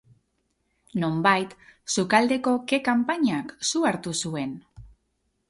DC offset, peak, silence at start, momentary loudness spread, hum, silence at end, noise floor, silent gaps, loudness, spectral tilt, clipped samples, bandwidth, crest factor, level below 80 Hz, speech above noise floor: under 0.1%; -4 dBFS; 0.95 s; 13 LU; none; 0.65 s; -74 dBFS; none; -24 LUFS; -4 dB/octave; under 0.1%; 11.5 kHz; 22 dB; -60 dBFS; 49 dB